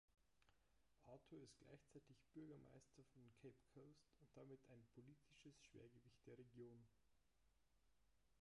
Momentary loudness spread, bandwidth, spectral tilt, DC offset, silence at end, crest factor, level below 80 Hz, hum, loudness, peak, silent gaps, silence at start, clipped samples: 6 LU; 11 kHz; -6 dB/octave; under 0.1%; 0 s; 16 dB; -86 dBFS; none; -67 LUFS; -52 dBFS; none; 0.1 s; under 0.1%